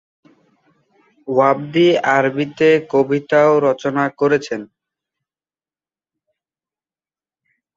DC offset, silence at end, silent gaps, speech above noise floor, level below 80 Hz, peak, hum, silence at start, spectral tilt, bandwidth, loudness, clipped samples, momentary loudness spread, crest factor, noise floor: under 0.1%; 3.1 s; none; over 75 dB; -64 dBFS; -2 dBFS; none; 1.25 s; -6 dB/octave; 7.6 kHz; -16 LUFS; under 0.1%; 7 LU; 18 dB; under -90 dBFS